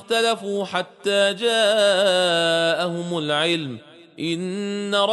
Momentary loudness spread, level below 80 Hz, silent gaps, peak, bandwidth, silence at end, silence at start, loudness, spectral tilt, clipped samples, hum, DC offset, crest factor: 10 LU; -70 dBFS; none; -6 dBFS; 11.5 kHz; 0 s; 0 s; -21 LUFS; -3.5 dB/octave; under 0.1%; none; under 0.1%; 16 dB